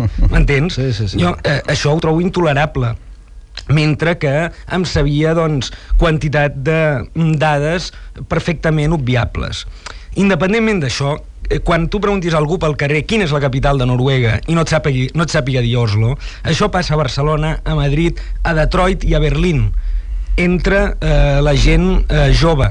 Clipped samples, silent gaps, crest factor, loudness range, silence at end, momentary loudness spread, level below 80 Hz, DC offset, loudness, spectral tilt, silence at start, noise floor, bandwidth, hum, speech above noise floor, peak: under 0.1%; none; 12 dB; 2 LU; 0 s; 7 LU; -20 dBFS; under 0.1%; -15 LUFS; -6.5 dB/octave; 0 s; -35 dBFS; 10 kHz; none; 21 dB; -2 dBFS